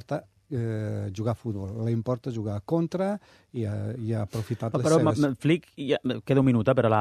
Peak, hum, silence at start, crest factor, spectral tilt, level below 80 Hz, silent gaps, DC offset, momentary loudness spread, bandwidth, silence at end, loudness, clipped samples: -8 dBFS; none; 0.1 s; 18 dB; -7.5 dB/octave; -60 dBFS; none; under 0.1%; 11 LU; 13.5 kHz; 0 s; -27 LUFS; under 0.1%